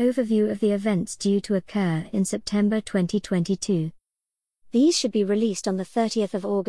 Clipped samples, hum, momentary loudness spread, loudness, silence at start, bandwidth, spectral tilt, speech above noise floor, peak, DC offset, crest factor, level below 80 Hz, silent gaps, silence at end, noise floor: under 0.1%; none; 5 LU; -24 LUFS; 0 s; 12 kHz; -5.5 dB/octave; 65 dB; -10 dBFS; 0.2%; 14 dB; -58 dBFS; none; 0.05 s; -88 dBFS